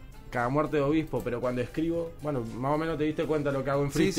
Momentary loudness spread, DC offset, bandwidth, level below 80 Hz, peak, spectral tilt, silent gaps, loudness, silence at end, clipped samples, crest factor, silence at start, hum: 6 LU; under 0.1%; 16 kHz; -46 dBFS; -12 dBFS; -6.5 dB/octave; none; -29 LUFS; 0 s; under 0.1%; 16 dB; 0 s; none